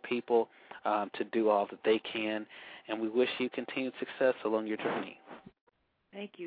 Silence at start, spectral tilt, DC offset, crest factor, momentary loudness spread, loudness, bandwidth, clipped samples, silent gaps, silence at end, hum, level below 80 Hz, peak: 0 s; -8 dB/octave; under 0.1%; 18 dB; 17 LU; -33 LUFS; 4.9 kHz; under 0.1%; 5.61-5.67 s; 0 s; none; -82 dBFS; -14 dBFS